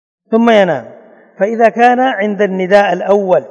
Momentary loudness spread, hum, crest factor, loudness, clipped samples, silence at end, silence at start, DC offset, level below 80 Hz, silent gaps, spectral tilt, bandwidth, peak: 8 LU; none; 12 dB; -12 LUFS; 0.6%; 0 s; 0.3 s; under 0.1%; -60 dBFS; none; -6.5 dB/octave; 9.6 kHz; 0 dBFS